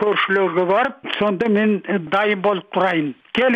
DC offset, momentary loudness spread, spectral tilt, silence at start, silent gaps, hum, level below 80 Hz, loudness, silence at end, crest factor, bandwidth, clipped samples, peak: under 0.1%; 5 LU; -7 dB/octave; 0 s; none; none; -60 dBFS; -19 LUFS; 0 s; 12 dB; 7.6 kHz; under 0.1%; -6 dBFS